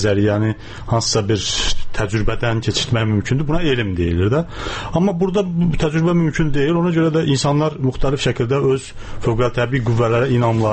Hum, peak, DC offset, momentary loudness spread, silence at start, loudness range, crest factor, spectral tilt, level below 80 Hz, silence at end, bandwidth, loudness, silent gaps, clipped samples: none; -4 dBFS; under 0.1%; 6 LU; 0 s; 2 LU; 12 dB; -5.5 dB/octave; -30 dBFS; 0 s; 8.8 kHz; -18 LUFS; none; under 0.1%